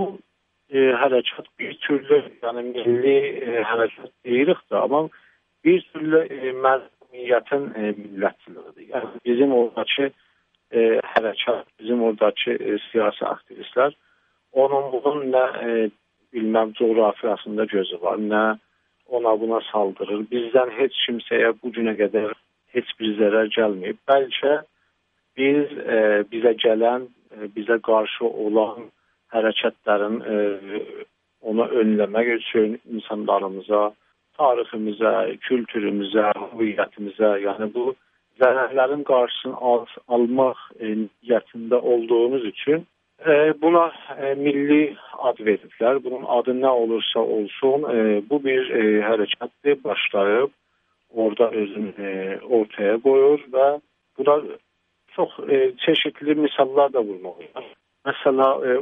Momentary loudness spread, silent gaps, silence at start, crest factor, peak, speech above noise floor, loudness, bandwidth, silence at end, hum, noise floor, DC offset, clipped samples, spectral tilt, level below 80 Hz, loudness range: 10 LU; none; 0 s; 18 dB; -4 dBFS; 49 dB; -21 LUFS; 3.9 kHz; 0 s; none; -70 dBFS; under 0.1%; under 0.1%; -8 dB/octave; -76 dBFS; 3 LU